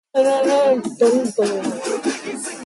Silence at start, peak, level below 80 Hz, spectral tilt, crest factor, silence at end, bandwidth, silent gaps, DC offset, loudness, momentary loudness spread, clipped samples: 0.15 s; -6 dBFS; -68 dBFS; -4 dB/octave; 14 dB; 0 s; 11.5 kHz; none; under 0.1%; -19 LUFS; 8 LU; under 0.1%